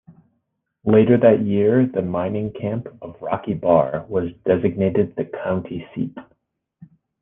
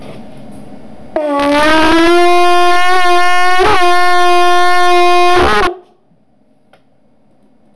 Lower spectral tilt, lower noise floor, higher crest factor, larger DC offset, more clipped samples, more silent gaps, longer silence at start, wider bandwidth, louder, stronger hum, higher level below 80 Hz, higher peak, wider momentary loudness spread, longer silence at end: first, -11.5 dB/octave vs -3.5 dB/octave; first, -73 dBFS vs -53 dBFS; first, 18 dB vs 8 dB; second, under 0.1% vs 20%; neither; neither; first, 0.85 s vs 0 s; second, 3.8 kHz vs 11 kHz; second, -20 LUFS vs -10 LUFS; neither; second, -56 dBFS vs -34 dBFS; about the same, -2 dBFS vs -4 dBFS; first, 14 LU vs 5 LU; first, 0.35 s vs 0 s